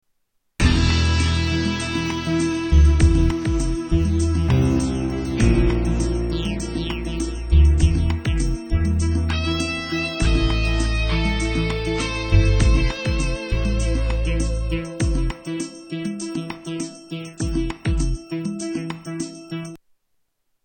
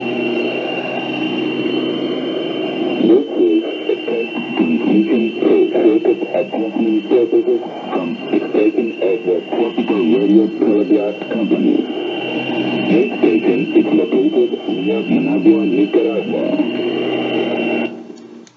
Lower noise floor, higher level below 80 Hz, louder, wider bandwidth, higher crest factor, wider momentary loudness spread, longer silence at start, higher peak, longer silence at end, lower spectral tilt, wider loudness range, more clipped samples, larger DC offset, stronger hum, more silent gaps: first, -69 dBFS vs -36 dBFS; first, -22 dBFS vs -74 dBFS; second, -22 LUFS vs -16 LUFS; first, 9.2 kHz vs 6.4 kHz; about the same, 16 dB vs 16 dB; first, 12 LU vs 7 LU; first, 0.6 s vs 0 s; second, -4 dBFS vs 0 dBFS; first, 0.9 s vs 0.15 s; second, -6 dB/octave vs -7.5 dB/octave; first, 8 LU vs 2 LU; neither; neither; neither; neither